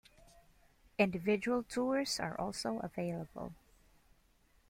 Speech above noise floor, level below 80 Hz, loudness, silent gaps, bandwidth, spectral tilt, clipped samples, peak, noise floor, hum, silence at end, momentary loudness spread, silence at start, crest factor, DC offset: 34 dB; -66 dBFS; -36 LUFS; none; 16.5 kHz; -4.5 dB/octave; under 0.1%; -16 dBFS; -70 dBFS; none; 1.15 s; 14 LU; 0.35 s; 22 dB; under 0.1%